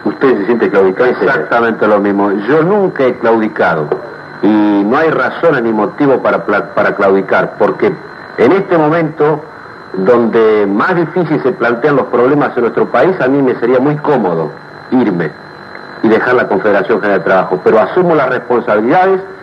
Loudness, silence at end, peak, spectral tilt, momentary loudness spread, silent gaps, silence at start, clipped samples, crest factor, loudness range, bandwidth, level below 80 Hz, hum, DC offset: -11 LUFS; 0 s; 0 dBFS; -8.5 dB/octave; 6 LU; none; 0 s; under 0.1%; 10 dB; 2 LU; 6.6 kHz; -56 dBFS; none; under 0.1%